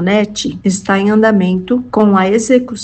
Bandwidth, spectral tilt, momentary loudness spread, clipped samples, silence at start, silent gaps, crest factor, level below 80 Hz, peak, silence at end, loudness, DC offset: 9 kHz; -5.5 dB/octave; 6 LU; under 0.1%; 0 s; none; 12 dB; -46 dBFS; 0 dBFS; 0 s; -12 LUFS; under 0.1%